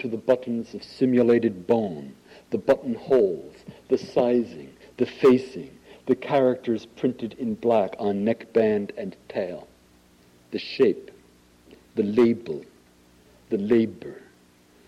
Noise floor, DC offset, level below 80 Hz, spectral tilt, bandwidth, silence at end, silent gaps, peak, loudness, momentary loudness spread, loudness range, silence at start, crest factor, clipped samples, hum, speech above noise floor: -57 dBFS; under 0.1%; -64 dBFS; -7.5 dB/octave; 11 kHz; 0.7 s; none; -8 dBFS; -24 LUFS; 17 LU; 3 LU; 0 s; 16 dB; under 0.1%; none; 33 dB